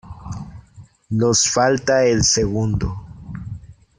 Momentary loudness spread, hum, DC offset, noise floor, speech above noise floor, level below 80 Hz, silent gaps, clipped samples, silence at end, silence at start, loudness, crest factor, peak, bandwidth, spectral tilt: 20 LU; none; under 0.1%; -46 dBFS; 29 dB; -38 dBFS; none; under 0.1%; 0.25 s; 0.05 s; -17 LUFS; 16 dB; -4 dBFS; 10.5 kHz; -4 dB/octave